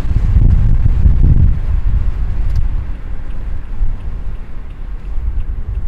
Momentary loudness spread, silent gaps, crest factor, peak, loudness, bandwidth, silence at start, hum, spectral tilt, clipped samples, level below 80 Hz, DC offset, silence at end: 16 LU; none; 12 dB; 0 dBFS; -17 LUFS; 3.4 kHz; 0 s; none; -9.5 dB/octave; under 0.1%; -14 dBFS; under 0.1%; 0 s